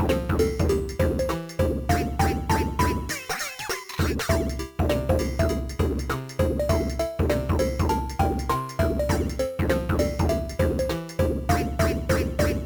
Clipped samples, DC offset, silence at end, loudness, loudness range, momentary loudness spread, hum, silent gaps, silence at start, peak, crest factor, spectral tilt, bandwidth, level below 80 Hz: under 0.1%; under 0.1%; 0 s; -25 LUFS; 1 LU; 5 LU; none; none; 0 s; -8 dBFS; 16 dB; -6 dB/octave; over 20 kHz; -32 dBFS